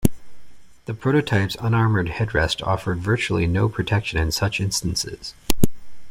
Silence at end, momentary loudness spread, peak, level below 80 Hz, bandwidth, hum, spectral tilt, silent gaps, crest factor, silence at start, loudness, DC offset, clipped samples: 0 s; 7 LU; 0 dBFS; -36 dBFS; 16.5 kHz; none; -5 dB/octave; none; 20 dB; 0 s; -22 LUFS; under 0.1%; under 0.1%